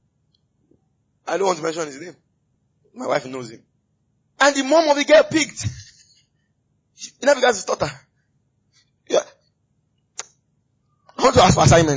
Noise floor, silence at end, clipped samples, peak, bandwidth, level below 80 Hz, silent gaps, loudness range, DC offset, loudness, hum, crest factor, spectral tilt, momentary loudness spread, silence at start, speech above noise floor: -68 dBFS; 0 s; under 0.1%; -4 dBFS; 8 kHz; -42 dBFS; none; 9 LU; under 0.1%; -18 LUFS; none; 18 dB; -4.5 dB/octave; 24 LU; 1.25 s; 50 dB